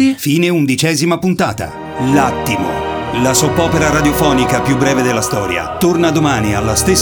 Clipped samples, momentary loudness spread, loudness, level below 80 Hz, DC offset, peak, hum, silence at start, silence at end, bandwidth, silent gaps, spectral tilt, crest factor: under 0.1%; 6 LU; -13 LUFS; -32 dBFS; under 0.1%; 0 dBFS; none; 0 s; 0 s; over 20 kHz; none; -4.5 dB/octave; 14 dB